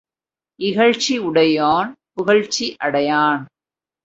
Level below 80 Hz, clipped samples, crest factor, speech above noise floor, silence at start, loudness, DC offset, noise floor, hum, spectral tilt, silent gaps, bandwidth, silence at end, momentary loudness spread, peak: -60 dBFS; under 0.1%; 18 dB; over 73 dB; 0.6 s; -18 LUFS; under 0.1%; under -90 dBFS; none; -4 dB/octave; none; 8 kHz; 0.6 s; 9 LU; -2 dBFS